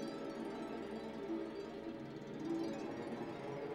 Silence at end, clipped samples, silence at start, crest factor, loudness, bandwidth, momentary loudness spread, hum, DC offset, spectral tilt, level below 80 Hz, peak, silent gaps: 0 s; under 0.1%; 0 s; 14 dB; -45 LUFS; 12.5 kHz; 6 LU; none; under 0.1%; -6.5 dB/octave; -74 dBFS; -30 dBFS; none